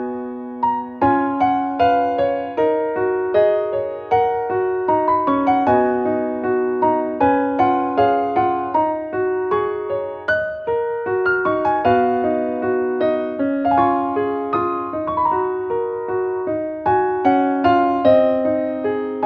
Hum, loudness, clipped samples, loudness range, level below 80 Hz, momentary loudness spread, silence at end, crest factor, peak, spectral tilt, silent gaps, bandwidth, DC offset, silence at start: none; -19 LUFS; under 0.1%; 2 LU; -52 dBFS; 6 LU; 0 s; 16 dB; -2 dBFS; -8.5 dB/octave; none; 5.4 kHz; under 0.1%; 0 s